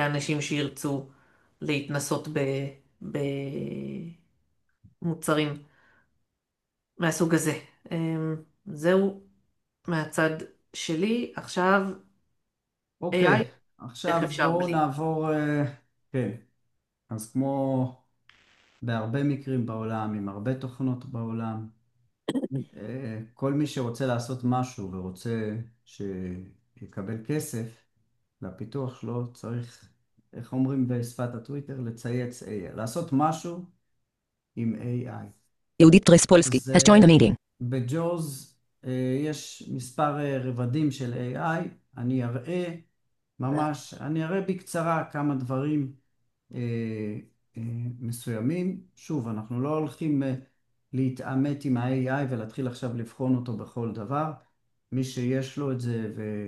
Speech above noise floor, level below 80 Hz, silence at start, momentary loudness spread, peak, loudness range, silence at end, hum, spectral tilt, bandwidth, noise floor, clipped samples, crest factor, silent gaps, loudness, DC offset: 58 dB; -60 dBFS; 0 s; 14 LU; -2 dBFS; 12 LU; 0 s; none; -5.5 dB/octave; 12.5 kHz; -84 dBFS; under 0.1%; 26 dB; none; -27 LUFS; under 0.1%